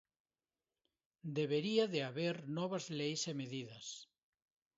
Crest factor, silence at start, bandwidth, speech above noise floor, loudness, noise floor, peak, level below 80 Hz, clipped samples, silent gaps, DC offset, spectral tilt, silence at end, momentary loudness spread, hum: 20 dB; 1.25 s; 7.6 kHz; over 51 dB; -39 LUFS; under -90 dBFS; -20 dBFS; -86 dBFS; under 0.1%; none; under 0.1%; -4.5 dB/octave; 0.75 s; 14 LU; none